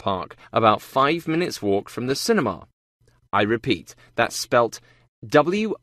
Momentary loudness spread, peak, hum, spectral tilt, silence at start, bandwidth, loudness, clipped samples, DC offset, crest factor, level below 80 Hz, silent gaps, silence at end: 8 LU; -2 dBFS; none; -4.5 dB/octave; 0.05 s; 14 kHz; -22 LUFS; under 0.1%; under 0.1%; 20 dB; -58 dBFS; 2.73-3.00 s, 5.08-5.22 s; 0.05 s